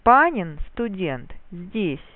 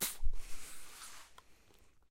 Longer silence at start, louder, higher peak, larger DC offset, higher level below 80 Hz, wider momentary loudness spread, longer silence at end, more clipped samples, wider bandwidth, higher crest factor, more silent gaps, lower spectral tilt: about the same, 0.05 s vs 0 s; first, -23 LUFS vs -47 LUFS; first, -2 dBFS vs -20 dBFS; neither; about the same, -40 dBFS vs -42 dBFS; about the same, 20 LU vs 22 LU; second, 0.1 s vs 0.6 s; neither; second, 4.2 kHz vs 16 kHz; about the same, 20 dB vs 16 dB; neither; first, -10 dB/octave vs -1.5 dB/octave